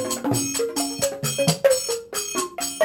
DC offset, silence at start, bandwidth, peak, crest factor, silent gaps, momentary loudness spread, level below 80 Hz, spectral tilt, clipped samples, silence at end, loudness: under 0.1%; 0 s; 17 kHz; -4 dBFS; 20 dB; none; 6 LU; -58 dBFS; -3 dB/octave; under 0.1%; 0 s; -23 LUFS